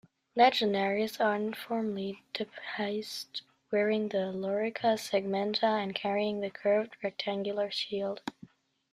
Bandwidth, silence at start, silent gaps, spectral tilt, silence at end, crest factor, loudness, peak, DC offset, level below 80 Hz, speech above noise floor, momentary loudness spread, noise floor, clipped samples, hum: 15 kHz; 0.35 s; none; -5 dB/octave; 0.6 s; 20 dB; -31 LUFS; -12 dBFS; under 0.1%; -76 dBFS; 26 dB; 9 LU; -56 dBFS; under 0.1%; none